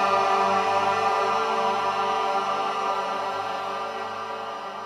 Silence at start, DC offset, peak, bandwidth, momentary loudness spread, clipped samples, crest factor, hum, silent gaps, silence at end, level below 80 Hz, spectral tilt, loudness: 0 s; under 0.1%; -10 dBFS; 13 kHz; 10 LU; under 0.1%; 14 dB; none; none; 0 s; -76 dBFS; -3 dB/octave; -25 LUFS